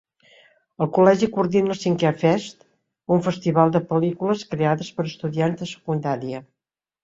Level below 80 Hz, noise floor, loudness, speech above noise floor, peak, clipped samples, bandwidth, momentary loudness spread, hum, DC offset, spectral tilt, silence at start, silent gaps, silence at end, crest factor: -62 dBFS; -87 dBFS; -22 LUFS; 66 dB; -2 dBFS; under 0.1%; 7.8 kHz; 11 LU; none; under 0.1%; -7 dB/octave; 0.8 s; none; 0.6 s; 20 dB